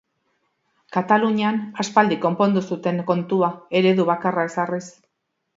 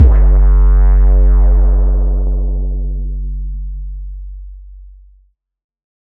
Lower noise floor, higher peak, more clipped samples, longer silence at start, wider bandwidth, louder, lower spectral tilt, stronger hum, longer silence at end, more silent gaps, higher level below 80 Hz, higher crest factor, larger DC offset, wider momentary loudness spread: first, -75 dBFS vs -52 dBFS; about the same, -2 dBFS vs 0 dBFS; neither; first, 0.9 s vs 0 s; first, 7.8 kHz vs 2 kHz; second, -21 LUFS vs -14 LUFS; second, -6 dB/octave vs -11.5 dB/octave; neither; second, 0.65 s vs 1.25 s; neither; second, -70 dBFS vs -12 dBFS; first, 20 dB vs 12 dB; neither; second, 7 LU vs 18 LU